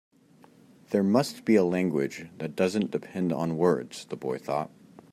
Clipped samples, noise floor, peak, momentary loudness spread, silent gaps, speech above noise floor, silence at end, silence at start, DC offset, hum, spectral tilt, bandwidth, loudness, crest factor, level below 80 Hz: under 0.1%; -57 dBFS; -10 dBFS; 12 LU; none; 30 dB; 0.45 s; 0.9 s; under 0.1%; none; -6.5 dB/octave; 15 kHz; -28 LUFS; 18 dB; -70 dBFS